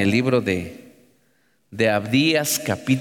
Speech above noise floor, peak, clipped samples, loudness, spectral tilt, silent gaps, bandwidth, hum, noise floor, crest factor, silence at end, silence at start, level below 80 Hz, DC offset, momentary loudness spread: 44 dB; -6 dBFS; under 0.1%; -20 LUFS; -4.5 dB/octave; none; 19 kHz; none; -65 dBFS; 16 dB; 0 s; 0 s; -58 dBFS; under 0.1%; 10 LU